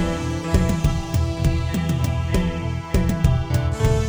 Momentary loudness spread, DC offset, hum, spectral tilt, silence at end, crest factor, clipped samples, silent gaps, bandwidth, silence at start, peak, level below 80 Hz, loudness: 4 LU; under 0.1%; none; -6.5 dB/octave; 0 s; 16 dB; under 0.1%; none; over 20 kHz; 0 s; -4 dBFS; -26 dBFS; -22 LUFS